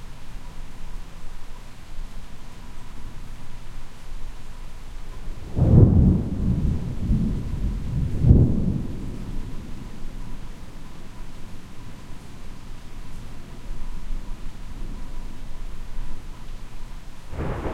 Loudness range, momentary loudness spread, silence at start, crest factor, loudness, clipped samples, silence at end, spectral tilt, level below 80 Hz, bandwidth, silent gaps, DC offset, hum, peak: 21 LU; 24 LU; 0 s; 22 dB; -22 LUFS; under 0.1%; 0 s; -8.5 dB/octave; -30 dBFS; 10.5 kHz; none; under 0.1%; none; -2 dBFS